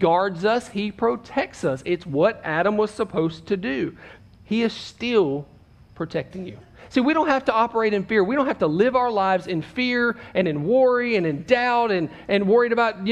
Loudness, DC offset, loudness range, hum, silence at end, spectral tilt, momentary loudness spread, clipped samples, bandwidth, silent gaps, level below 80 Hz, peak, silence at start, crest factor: -22 LUFS; under 0.1%; 5 LU; none; 0 s; -6.5 dB/octave; 9 LU; under 0.1%; 10.5 kHz; none; -56 dBFS; -4 dBFS; 0 s; 18 dB